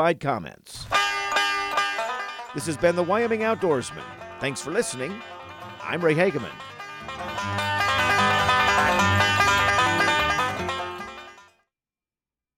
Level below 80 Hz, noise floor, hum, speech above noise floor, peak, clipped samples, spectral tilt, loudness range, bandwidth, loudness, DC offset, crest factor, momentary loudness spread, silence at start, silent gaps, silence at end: -52 dBFS; under -90 dBFS; none; over 65 dB; -8 dBFS; under 0.1%; -3.5 dB/octave; 7 LU; 17 kHz; -23 LUFS; under 0.1%; 18 dB; 18 LU; 0 s; none; 1.15 s